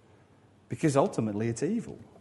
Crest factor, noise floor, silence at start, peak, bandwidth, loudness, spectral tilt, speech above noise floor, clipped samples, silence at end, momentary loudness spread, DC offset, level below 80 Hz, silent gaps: 20 dB; -60 dBFS; 0.7 s; -10 dBFS; 11.5 kHz; -29 LUFS; -6.5 dB/octave; 31 dB; under 0.1%; 0.2 s; 14 LU; under 0.1%; -66 dBFS; none